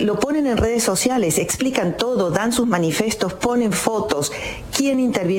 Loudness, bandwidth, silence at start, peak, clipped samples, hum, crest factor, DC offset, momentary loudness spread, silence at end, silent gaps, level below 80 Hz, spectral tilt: -19 LUFS; 17 kHz; 0 s; 0 dBFS; under 0.1%; none; 18 dB; under 0.1%; 4 LU; 0 s; none; -40 dBFS; -4 dB/octave